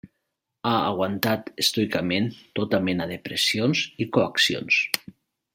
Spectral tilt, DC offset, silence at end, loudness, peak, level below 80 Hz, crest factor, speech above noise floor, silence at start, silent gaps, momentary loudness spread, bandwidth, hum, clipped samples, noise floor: -4 dB/octave; under 0.1%; 0.45 s; -24 LUFS; 0 dBFS; -64 dBFS; 26 dB; 55 dB; 0.05 s; none; 8 LU; 16.5 kHz; none; under 0.1%; -79 dBFS